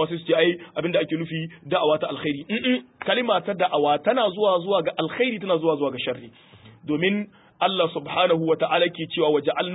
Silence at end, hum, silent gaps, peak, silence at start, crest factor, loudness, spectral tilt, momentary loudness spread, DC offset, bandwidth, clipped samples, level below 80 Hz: 0 s; none; none; -8 dBFS; 0 s; 16 dB; -23 LUFS; -10 dB/octave; 8 LU; under 0.1%; 4 kHz; under 0.1%; -68 dBFS